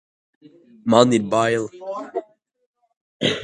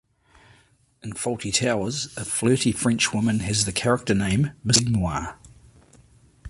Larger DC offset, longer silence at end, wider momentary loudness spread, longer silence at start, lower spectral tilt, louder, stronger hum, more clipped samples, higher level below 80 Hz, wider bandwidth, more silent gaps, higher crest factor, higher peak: neither; about the same, 0 s vs 0 s; first, 16 LU vs 10 LU; second, 0.85 s vs 1.05 s; about the same, -5 dB/octave vs -4 dB/octave; first, -20 LUFS vs -23 LUFS; neither; neither; second, -62 dBFS vs -46 dBFS; about the same, 11 kHz vs 11.5 kHz; first, 2.66-2.74 s, 2.97-3.20 s vs none; about the same, 22 dB vs 22 dB; about the same, 0 dBFS vs -2 dBFS